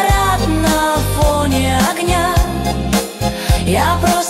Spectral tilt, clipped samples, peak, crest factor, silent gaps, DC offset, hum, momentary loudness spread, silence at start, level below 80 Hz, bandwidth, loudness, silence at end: -4.5 dB/octave; under 0.1%; -2 dBFS; 12 dB; none; under 0.1%; none; 4 LU; 0 s; -22 dBFS; 16.5 kHz; -15 LUFS; 0 s